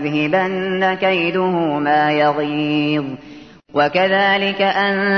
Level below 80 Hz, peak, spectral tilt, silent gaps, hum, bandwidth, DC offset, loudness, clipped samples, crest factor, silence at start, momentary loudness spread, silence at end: -58 dBFS; -2 dBFS; -7 dB/octave; none; none; 6.4 kHz; 0.1%; -17 LUFS; under 0.1%; 14 dB; 0 s; 5 LU; 0 s